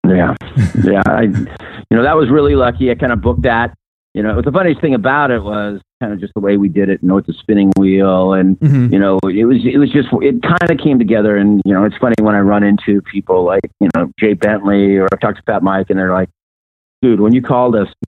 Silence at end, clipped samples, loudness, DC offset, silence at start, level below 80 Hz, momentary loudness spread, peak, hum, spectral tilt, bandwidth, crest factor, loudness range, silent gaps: 0 s; under 0.1%; -12 LUFS; under 0.1%; 0.05 s; -34 dBFS; 6 LU; 0 dBFS; none; -9 dB/octave; 9 kHz; 12 dB; 3 LU; 3.87-4.15 s, 5.93-6.01 s, 16.43-17.02 s